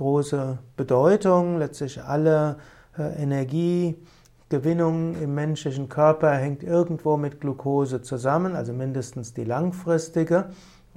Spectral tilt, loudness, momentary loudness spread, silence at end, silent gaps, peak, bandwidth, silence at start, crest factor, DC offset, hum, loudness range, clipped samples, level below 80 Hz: -7.5 dB/octave; -24 LUFS; 12 LU; 0.35 s; none; -6 dBFS; 12.5 kHz; 0 s; 18 dB; under 0.1%; none; 3 LU; under 0.1%; -58 dBFS